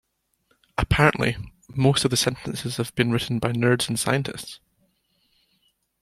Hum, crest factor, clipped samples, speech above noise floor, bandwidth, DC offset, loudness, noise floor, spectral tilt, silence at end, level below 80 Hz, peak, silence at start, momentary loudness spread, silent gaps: none; 22 dB; under 0.1%; 46 dB; 15 kHz; under 0.1%; -23 LUFS; -69 dBFS; -4.5 dB/octave; 1.45 s; -44 dBFS; -2 dBFS; 0.8 s; 15 LU; none